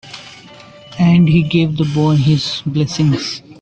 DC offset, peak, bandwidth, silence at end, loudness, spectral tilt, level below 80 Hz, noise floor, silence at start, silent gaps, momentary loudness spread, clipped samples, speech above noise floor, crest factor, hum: under 0.1%; -2 dBFS; 8.4 kHz; 0.1 s; -14 LUFS; -6.5 dB/octave; -44 dBFS; -39 dBFS; 0.05 s; none; 15 LU; under 0.1%; 25 dB; 14 dB; none